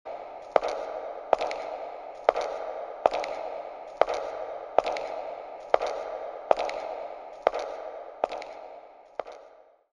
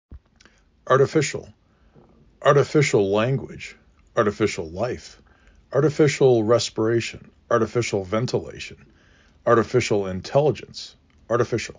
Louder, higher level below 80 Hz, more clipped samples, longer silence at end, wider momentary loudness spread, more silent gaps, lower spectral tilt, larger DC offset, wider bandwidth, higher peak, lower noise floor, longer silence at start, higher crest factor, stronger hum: second, -31 LUFS vs -22 LUFS; second, -64 dBFS vs -52 dBFS; neither; first, 0.3 s vs 0.05 s; second, 13 LU vs 17 LU; neither; second, -3 dB/octave vs -5.5 dB/octave; neither; first, 10.5 kHz vs 7.6 kHz; about the same, -4 dBFS vs -4 dBFS; about the same, -55 dBFS vs -56 dBFS; about the same, 0.05 s vs 0.1 s; first, 28 dB vs 18 dB; neither